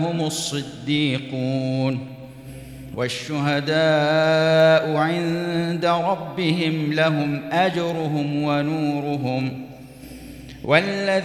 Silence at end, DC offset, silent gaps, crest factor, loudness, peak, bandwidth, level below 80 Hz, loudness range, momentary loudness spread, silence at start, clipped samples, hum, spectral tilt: 0 s; under 0.1%; none; 20 dB; -21 LUFS; -2 dBFS; 13.5 kHz; -54 dBFS; 6 LU; 21 LU; 0 s; under 0.1%; none; -5.5 dB/octave